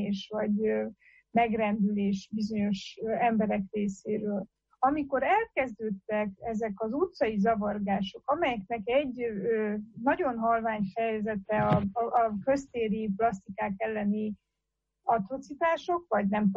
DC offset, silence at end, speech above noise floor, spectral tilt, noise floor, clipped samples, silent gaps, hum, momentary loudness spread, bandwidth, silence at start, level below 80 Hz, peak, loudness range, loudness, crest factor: under 0.1%; 0 s; 55 dB; -7 dB/octave; -84 dBFS; under 0.1%; none; none; 7 LU; 7.8 kHz; 0 s; -60 dBFS; -14 dBFS; 2 LU; -30 LUFS; 16 dB